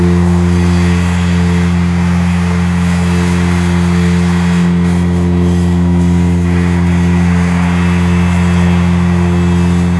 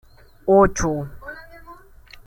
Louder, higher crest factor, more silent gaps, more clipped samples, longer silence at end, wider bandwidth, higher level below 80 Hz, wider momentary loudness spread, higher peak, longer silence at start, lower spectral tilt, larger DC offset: first, -11 LUFS vs -19 LUFS; second, 10 dB vs 18 dB; neither; neither; second, 0 s vs 0.55 s; second, 12 kHz vs 16.5 kHz; first, -30 dBFS vs -38 dBFS; second, 1 LU vs 22 LU; first, 0 dBFS vs -4 dBFS; second, 0 s vs 0.45 s; about the same, -7 dB/octave vs -6 dB/octave; first, 0.3% vs under 0.1%